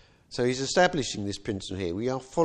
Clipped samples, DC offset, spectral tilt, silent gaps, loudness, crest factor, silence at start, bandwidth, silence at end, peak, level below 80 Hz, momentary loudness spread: under 0.1%; under 0.1%; -4.5 dB/octave; none; -28 LUFS; 18 dB; 0.3 s; 10.5 kHz; 0 s; -10 dBFS; -54 dBFS; 10 LU